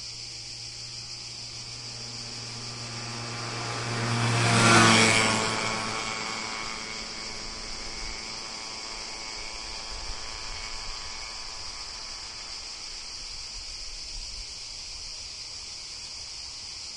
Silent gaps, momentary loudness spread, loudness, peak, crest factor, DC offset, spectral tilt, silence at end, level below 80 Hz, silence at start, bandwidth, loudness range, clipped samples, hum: none; 14 LU; -29 LUFS; -4 dBFS; 26 dB; under 0.1%; -3 dB/octave; 0 s; -48 dBFS; 0 s; 11.5 kHz; 13 LU; under 0.1%; none